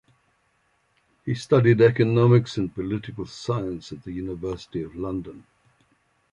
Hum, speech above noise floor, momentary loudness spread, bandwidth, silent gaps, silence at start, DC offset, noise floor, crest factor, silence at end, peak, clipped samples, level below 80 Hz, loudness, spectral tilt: none; 45 dB; 17 LU; 10.5 kHz; none; 1.25 s; under 0.1%; -68 dBFS; 20 dB; 0.95 s; -6 dBFS; under 0.1%; -52 dBFS; -23 LUFS; -8 dB/octave